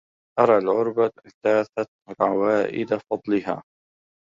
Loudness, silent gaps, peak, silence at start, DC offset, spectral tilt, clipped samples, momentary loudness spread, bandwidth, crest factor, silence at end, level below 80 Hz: -23 LUFS; 1.34-1.41 s, 1.88-1.99 s; -4 dBFS; 0.35 s; under 0.1%; -7.5 dB/octave; under 0.1%; 12 LU; 7.4 kHz; 20 dB; 0.65 s; -66 dBFS